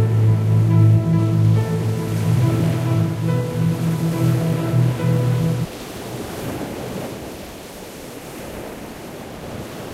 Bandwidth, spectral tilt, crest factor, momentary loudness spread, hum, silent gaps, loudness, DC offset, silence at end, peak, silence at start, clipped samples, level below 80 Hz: 15.5 kHz; -7.5 dB/octave; 14 dB; 17 LU; none; none; -19 LUFS; under 0.1%; 0 s; -4 dBFS; 0 s; under 0.1%; -44 dBFS